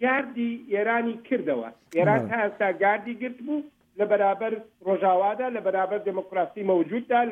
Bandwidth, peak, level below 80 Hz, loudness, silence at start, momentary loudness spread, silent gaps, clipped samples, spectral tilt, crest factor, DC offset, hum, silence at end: 7.8 kHz; -10 dBFS; -76 dBFS; -26 LUFS; 0 s; 9 LU; none; under 0.1%; -8 dB/octave; 16 dB; under 0.1%; none; 0 s